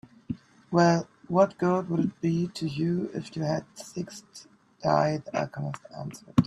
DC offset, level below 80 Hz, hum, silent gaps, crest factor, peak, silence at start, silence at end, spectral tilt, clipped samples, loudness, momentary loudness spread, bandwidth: under 0.1%; -62 dBFS; none; none; 22 dB; -6 dBFS; 0.3 s; 0 s; -7 dB/octave; under 0.1%; -28 LUFS; 16 LU; 12 kHz